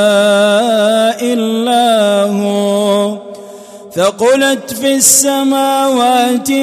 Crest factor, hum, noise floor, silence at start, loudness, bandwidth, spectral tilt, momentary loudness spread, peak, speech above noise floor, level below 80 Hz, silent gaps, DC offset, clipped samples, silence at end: 12 dB; none; -32 dBFS; 0 s; -11 LUFS; 16 kHz; -3 dB/octave; 6 LU; 0 dBFS; 21 dB; -60 dBFS; none; under 0.1%; under 0.1%; 0 s